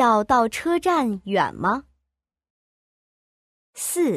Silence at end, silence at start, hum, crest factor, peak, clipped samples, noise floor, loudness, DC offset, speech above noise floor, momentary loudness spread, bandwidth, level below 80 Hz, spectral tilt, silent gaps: 0 s; 0 s; none; 18 dB; -6 dBFS; under 0.1%; -82 dBFS; -22 LUFS; under 0.1%; 61 dB; 8 LU; 15.5 kHz; -56 dBFS; -4 dB/octave; 2.50-3.73 s